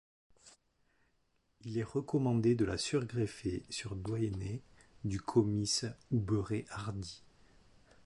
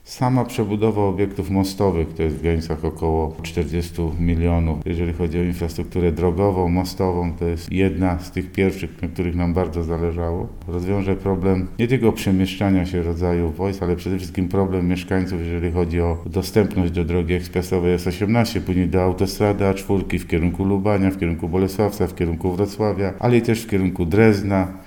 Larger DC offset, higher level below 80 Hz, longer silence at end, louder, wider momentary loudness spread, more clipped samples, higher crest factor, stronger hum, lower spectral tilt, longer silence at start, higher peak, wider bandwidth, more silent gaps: neither; second, -58 dBFS vs -34 dBFS; first, 0.9 s vs 0 s; second, -36 LUFS vs -21 LUFS; first, 12 LU vs 6 LU; neither; about the same, 20 dB vs 18 dB; neither; second, -5.5 dB/octave vs -7.5 dB/octave; first, 0.45 s vs 0.05 s; second, -16 dBFS vs -2 dBFS; second, 11.5 kHz vs 19 kHz; neither